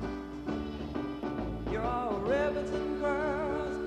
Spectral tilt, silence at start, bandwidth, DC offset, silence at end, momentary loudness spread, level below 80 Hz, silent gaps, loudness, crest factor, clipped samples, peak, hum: -7 dB/octave; 0 s; 10 kHz; under 0.1%; 0 s; 7 LU; -46 dBFS; none; -33 LUFS; 14 dB; under 0.1%; -20 dBFS; none